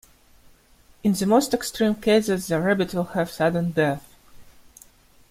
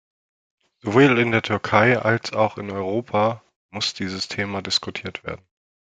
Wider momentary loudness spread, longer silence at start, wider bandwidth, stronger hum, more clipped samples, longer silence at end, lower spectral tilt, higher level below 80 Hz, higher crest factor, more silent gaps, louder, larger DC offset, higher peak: second, 6 LU vs 17 LU; first, 1.05 s vs 0.85 s; first, 16 kHz vs 9.4 kHz; neither; neither; first, 0.9 s vs 0.65 s; about the same, -5.5 dB/octave vs -5 dB/octave; first, -54 dBFS vs -62 dBFS; about the same, 18 dB vs 20 dB; second, none vs 3.56-3.69 s; about the same, -23 LUFS vs -21 LUFS; neither; second, -6 dBFS vs -2 dBFS